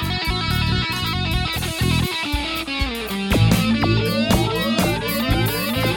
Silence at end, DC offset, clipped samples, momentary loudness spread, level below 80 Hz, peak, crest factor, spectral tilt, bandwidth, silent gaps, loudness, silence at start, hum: 0 s; under 0.1%; under 0.1%; 5 LU; -30 dBFS; -4 dBFS; 16 dB; -5 dB/octave; 17.5 kHz; none; -20 LUFS; 0 s; none